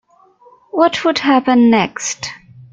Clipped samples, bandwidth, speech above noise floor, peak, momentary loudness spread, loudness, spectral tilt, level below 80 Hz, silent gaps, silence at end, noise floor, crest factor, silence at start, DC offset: under 0.1%; 7.8 kHz; 35 dB; 0 dBFS; 13 LU; -14 LUFS; -3.5 dB/octave; -58 dBFS; none; 0.1 s; -48 dBFS; 14 dB; 0.75 s; under 0.1%